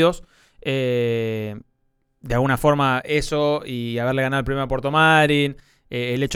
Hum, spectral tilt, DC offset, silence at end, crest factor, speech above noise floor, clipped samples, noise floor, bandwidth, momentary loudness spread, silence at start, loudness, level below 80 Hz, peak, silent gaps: none; -5.5 dB/octave; under 0.1%; 0 s; 18 dB; 47 dB; under 0.1%; -67 dBFS; 18.5 kHz; 13 LU; 0 s; -20 LUFS; -42 dBFS; -2 dBFS; none